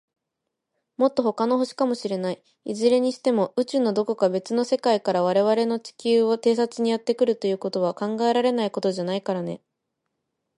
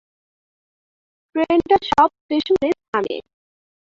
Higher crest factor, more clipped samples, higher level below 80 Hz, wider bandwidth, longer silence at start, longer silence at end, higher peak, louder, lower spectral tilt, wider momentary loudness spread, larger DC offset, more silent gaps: about the same, 16 dB vs 18 dB; neither; second, -74 dBFS vs -52 dBFS; first, 11 kHz vs 7.6 kHz; second, 1 s vs 1.35 s; first, 1 s vs 0.8 s; second, -8 dBFS vs -2 dBFS; second, -23 LUFS vs -19 LUFS; about the same, -5.5 dB/octave vs -5.5 dB/octave; second, 7 LU vs 11 LU; neither; second, none vs 2.21-2.29 s, 2.88-2.93 s